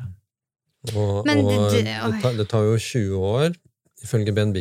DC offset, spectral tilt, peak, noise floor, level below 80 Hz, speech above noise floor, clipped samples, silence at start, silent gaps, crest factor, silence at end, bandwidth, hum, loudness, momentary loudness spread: under 0.1%; -6 dB/octave; -6 dBFS; -43 dBFS; -58 dBFS; 22 dB; under 0.1%; 0 s; none; 16 dB; 0 s; 15 kHz; none; -22 LUFS; 13 LU